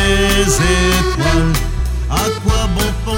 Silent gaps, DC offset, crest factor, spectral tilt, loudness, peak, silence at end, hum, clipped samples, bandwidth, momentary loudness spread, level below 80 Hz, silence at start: none; under 0.1%; 14 dB; -4 dB/octave; -15 LUFS; 0 dBFS; 0 s; none; under 0.1%; 17 kHz; 6 LU; -18 dBFS; 0 s